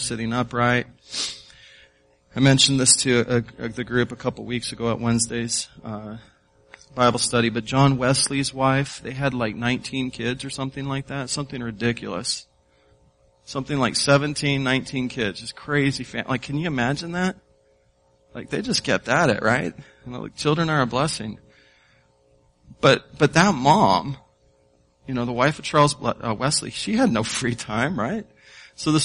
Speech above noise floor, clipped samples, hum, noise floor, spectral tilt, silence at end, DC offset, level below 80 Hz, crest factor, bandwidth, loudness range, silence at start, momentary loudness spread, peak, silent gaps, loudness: 39 dB; under 0.1%; none; -61 dBFS; -4 dB/octave; 0 s; under 0.1%; -52 dBFS; 22 dB; 11 kHz; 6 LU; 0 s; 14 LU; -2 dBFS; none; -22 LUFS